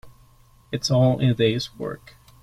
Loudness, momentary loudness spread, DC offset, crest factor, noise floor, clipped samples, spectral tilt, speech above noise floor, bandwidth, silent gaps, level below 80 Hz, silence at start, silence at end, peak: -22 LUFS; 14 LU; under 0.1%; 16 dB; -54 dBFS; under 0.1%; -6 dB/octave; 33 dB; 12 kHz; none; -50 dBFS; 0.05 s; 0.45 s; -8 dBFS